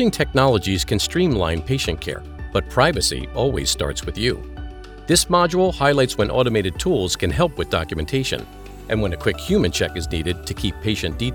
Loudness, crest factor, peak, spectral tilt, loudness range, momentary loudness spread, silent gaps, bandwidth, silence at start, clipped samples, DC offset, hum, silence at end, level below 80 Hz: -20 LUFS; 18 dB; -2 dBFS; -4.5 dB/octave; 4 LU; 9 LU; none; over 20 kHz; 0 s; under 0.1%; under 0.1%; none; 0 s; -34 dBFS